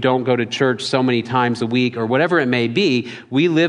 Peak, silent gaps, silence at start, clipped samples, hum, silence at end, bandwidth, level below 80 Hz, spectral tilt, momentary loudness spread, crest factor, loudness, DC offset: -2 dBFS; none; 0 s; under 0.1%; none; 0 s; 10.5 kHz; -66 dBFS; -6 dB/octave; 3 LU; 16 dB; -18 LUFS; under 0.1%